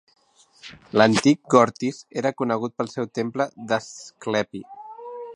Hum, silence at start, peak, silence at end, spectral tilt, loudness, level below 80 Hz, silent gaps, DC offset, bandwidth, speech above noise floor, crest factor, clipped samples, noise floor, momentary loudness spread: none; 0.65 s; -2 dBFS; 0 s; -5 dB/octave; -22 LUFS; -66 dBFS; none; under 0.1%; 11.5 kHz; 29 dB; 22 dB; under 0.1%; -52 dBFS; 21 LU